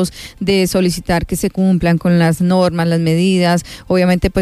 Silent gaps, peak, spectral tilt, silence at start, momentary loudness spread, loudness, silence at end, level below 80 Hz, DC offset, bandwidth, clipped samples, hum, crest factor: none; -2 dBFS; -6 dB/octave; 0 s; 5 LU; -15 LUFS; 0 s; -34 dBFS; under 0.1%; 15 kHz; under 0.1%; none; 12 dB